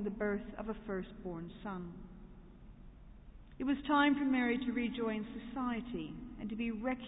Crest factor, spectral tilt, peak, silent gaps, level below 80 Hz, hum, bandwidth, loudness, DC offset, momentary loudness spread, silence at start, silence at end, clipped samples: 18 dB; -2.5 dB/octave; -20 dBFS; none; -56 dBFS; none; 3.9 kHz; -37 LUFS; under 0.1%; 20 LU; 0 s; 0 s; under 0.1%